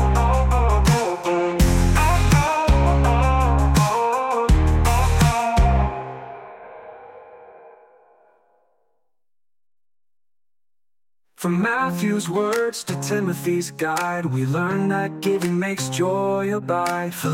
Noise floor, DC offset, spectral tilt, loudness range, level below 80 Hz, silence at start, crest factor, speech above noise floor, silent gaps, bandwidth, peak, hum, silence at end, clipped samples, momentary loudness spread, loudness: under -90 dBFS; under 0.1%; -6 dB/octave; 9 LU; -26 dBFS; 0 s; 16 dB; over 68 dB; none; 16.5 kHz; -6 dBFS; none; 0 s; under 0.1%; 7 LU; -20 LUFS